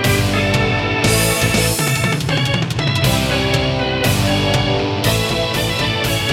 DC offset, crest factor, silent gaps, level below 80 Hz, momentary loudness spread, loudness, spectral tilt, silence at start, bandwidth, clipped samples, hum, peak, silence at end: under 0.1%; 14 dB; none; -32 dBFS; 3 LU; -16 LUFS; -4 dB/octave; 0 s; 17 kHz; under 0.1%; none; -2 dBFS; 0 s